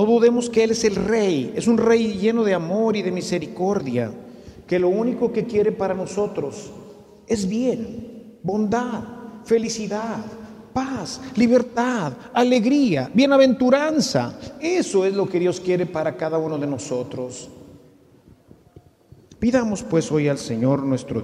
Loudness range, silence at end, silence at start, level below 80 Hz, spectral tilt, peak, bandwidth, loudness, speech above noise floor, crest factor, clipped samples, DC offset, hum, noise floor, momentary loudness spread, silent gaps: 8 LU; 0 s; 0 s; -56 dBFS; -5.5 dB/octave; -4 dBFS; 12.5 kHz; -21 LUFS; 31 dB; 16 dB; under 0.1%; under 0.1%; none; -52 dBFS; 14 LU; none